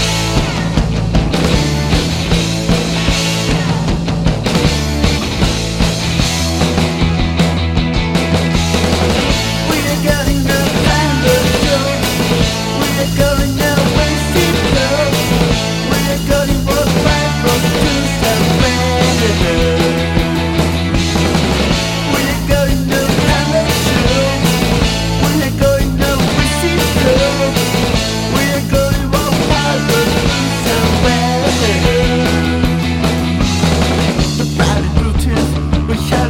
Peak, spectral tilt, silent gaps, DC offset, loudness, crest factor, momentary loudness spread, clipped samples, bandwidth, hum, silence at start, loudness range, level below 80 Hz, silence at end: 0 dBFS; -5 dB/octave; none; under 0.1%; -13 LUFS; 12 dB; 3 LU; under 0.1%; 17.5 kHz; none; 0 s; 1 LU; -22 dBFS; 0 s